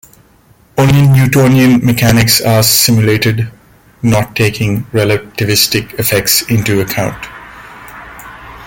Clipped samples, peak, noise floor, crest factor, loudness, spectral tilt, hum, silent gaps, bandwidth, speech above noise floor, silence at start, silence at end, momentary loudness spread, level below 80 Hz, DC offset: under 0.1%; 0 dBFS; -46 dBFS; 12 dB; -10 LUFS; -4.5 dB/octave; none; none; 17.5 kHz; 36 dB; 0.75 s; 0 s; 22 LU; -36 dBFS; under 0.1%